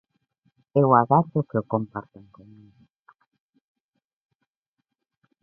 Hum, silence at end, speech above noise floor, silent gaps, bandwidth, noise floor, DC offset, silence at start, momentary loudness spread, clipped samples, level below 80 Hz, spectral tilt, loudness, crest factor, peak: none; 3.4 s; 59 dB; none; 3.2 kHz; -81 dBFS; under 0.1%; 0.75 s; 14 LU; under 0.1%; -64 dBFS; -13 dB/octave; -22 LUFS; 24 dB; -2 dBFS